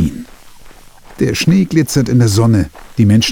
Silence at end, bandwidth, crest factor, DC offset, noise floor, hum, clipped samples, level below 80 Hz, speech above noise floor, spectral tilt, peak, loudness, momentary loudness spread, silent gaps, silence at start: 0 s; 18 kHz; 12 dB; under 0.1%; -37 dBFS; none; under 0.1%; -36 dBFS; 26 dB; -6 dB/octave; 0 dBFS; -13 LUFS; 8 LU; none; 0 s